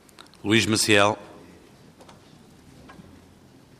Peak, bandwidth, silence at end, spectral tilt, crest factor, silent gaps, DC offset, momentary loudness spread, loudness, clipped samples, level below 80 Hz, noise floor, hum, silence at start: -4 dBFS; 15 kHz; 0.85 s; -3.5 dB/octave; 22 dB; none; under 0.1%; 16 LU; -21 LUFS; under 0.1%; -64 dBFS; -52 dBFS; none; 0.45 s